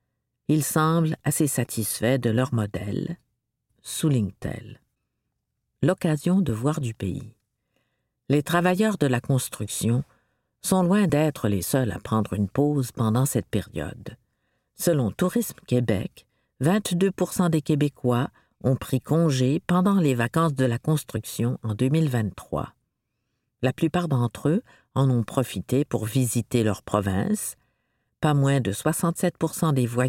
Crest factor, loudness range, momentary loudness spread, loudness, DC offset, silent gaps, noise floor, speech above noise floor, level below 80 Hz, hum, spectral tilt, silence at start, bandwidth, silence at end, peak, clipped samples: 20 dB; 4 LU; 10 LU; -24 LUFS; under 0.1%; none; -79 dBFS; 55 dB; -54 dBFS; none; -6 dB/octave; 0.5 s; 17 kHz; 0 s; -6 dBFS; under 0.1%